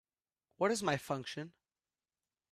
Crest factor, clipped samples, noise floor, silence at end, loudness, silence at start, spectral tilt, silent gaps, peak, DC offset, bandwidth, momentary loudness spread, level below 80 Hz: 22 dB; under 0.1%; under -90 dBFS; 1 s; -37 LUFS; 0.6 s; -4.5 dB/octave; none; -18 dBFS; under 0.1%; 15 kHz; 13 LU; -76 dBFS